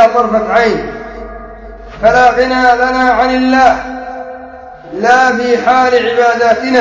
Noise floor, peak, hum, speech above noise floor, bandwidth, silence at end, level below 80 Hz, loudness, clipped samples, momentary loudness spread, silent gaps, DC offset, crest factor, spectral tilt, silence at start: -30 dBFS; 0 dBFS; none; 21 dB; 8 kHz; 0 s; -36 dBFS; -10 LUFS; 0.5%; 19 LU; none; under 0.1%; 10 dB; -4.5 dB/octave; 0 s